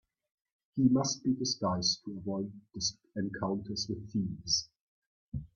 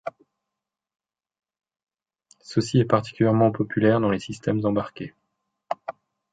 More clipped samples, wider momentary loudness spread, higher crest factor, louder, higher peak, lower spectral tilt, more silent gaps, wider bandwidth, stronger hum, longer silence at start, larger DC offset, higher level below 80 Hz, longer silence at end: neither; second, 12 LU vs 17 LU; about the same, 20 dB vs 20 dB; second, -33 LUFS vs -23 LUFS; second, -14 dBFS vs -4 dBFS; second, -4 dB/octave vs -7.5 dB/octave; first, 4.81-5.32 s vs none; second, 7.4 kHz vs 9.2 kHz; neither; first, 0.75 s vs 0.05 s; neither; about the same, -60 dBFS vs -58 dBFS; second, 0.1 s vs 0.4 s